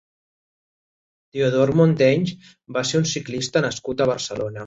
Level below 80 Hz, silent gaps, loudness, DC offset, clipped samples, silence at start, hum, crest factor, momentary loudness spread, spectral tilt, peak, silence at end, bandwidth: -56 dBFS; none; -21 LUFS; under 0.1%; under 0.1%; 1.35 s; none; 18 dB; 11 LU; -5.5 dB/octave; -4 dBFS; 0 s; 8 kHz